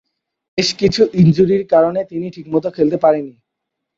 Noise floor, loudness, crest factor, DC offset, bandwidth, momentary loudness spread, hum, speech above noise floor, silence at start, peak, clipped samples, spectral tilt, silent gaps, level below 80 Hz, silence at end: -78 dBFS; -15 LUFS; 14 dB; under 0.1%; 8 kHz; 13 LU; none; 63 dB; 0.55 s; -2 dBFS; under 0.1%; -6.5 dB/octave; none; -48 dBFS; 0.7 s